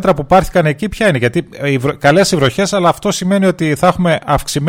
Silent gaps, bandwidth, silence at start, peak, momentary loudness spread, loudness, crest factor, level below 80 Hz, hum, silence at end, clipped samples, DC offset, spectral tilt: none; 16.5 kHz; 0 s; 0 dBFS; 6 LU; -13 LUFS; 12 dB; -34 dBFS; none; 0 s; under 0.1%; under 0.1%; -5.5 dB/octave